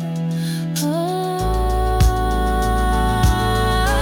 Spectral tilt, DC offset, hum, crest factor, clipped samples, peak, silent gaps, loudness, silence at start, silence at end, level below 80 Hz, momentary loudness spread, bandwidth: -5.5 dB/octave; under 0.1%; none; 12 dB; under 0.1%; -6 dBFS; none; -19 LUFS; 0 s; 0 s; -22 dBFS; 5 LU; 18 kHz